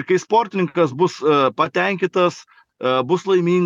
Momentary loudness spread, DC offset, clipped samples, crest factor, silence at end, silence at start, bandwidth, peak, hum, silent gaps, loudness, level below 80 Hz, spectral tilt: 4 LU; under 0.1%; under 0.1%; 14 dB; 0 s; 0 s; 7.6 kHz; -4 dBFS; none; none; -18 LUFS; -74 dBFS; -6 dB/octave